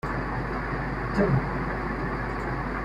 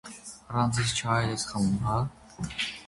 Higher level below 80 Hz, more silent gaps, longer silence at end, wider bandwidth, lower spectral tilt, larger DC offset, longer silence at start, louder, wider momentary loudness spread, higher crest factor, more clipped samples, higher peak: first, -36 dBFS vs -50 dBFS; neither; about the same, 0 s vs 0 s; about the same, 11 kHz vs 11.5 kHz; first, -8 dB/octave vs -4.5 dB/octave; neither; about the same, 0.05 s vs 0.05 s; about the same, -28 LUFS vs -29 LUFS; second, 6 LU vs 12 LU; about the same, 18 dB vs 20 dB; neither; about the same, -10 dBFS vs -10 dBFS